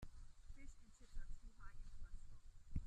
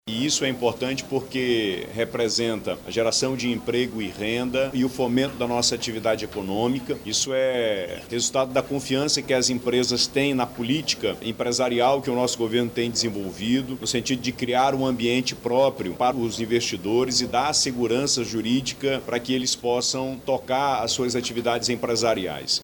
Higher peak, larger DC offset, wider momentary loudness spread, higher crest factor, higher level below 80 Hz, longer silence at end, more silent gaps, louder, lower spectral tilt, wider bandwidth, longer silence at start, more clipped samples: second, -30 dBFS vs -8 dBFS; neither; about the same, 7 LU vs 5 LU; about the same, 20 dB vs 16 dB; about the same, -54 dBFS vs -54 dBFS; about the same, 0 s vs 0 s; neither; second, -62 LUFS vs -24 LUFS; first, -6 dB/octave vs -3.5 dB/octave; second, 9.2 kHz vs 19.5 kHz; about the same, 0 s vs 0.05 s; neither